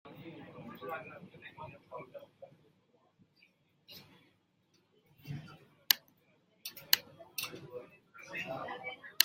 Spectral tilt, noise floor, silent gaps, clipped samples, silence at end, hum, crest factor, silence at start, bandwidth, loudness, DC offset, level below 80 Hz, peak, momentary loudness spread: -1 dB/octave; -73 dBFS; none; under 0.1%; 0 s; none; 40 dB; 0.05 s; 16.5 kHz; -37 LUFS; under 0.1%; -82 dBFS; -2 dBFS; 24 LU